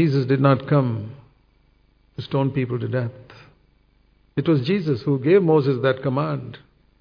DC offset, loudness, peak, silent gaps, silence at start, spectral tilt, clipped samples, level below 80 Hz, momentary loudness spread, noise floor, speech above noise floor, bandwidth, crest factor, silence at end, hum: under 0.1%; -21 LUFS; -2 dBFS; none; 0 s; -10 dB/octave; under 0.1%; -58 dBFS; 14 LU; -59 dBFS; 39 dB; 5.4 kHz; 20 dB; 0.45 s; none